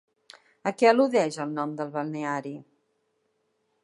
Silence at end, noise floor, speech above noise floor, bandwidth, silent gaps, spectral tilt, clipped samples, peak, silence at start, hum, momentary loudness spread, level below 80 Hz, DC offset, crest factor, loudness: 1.2 s; -74 dBFS; 48 dB; 11.5 kHz; none; -5.5 dB/octave; under 0.1%; -6 dBFS; 0.65 s; none; 13 LU; -84 dBFS; under 0.1%; 22 dB; -26 LUFS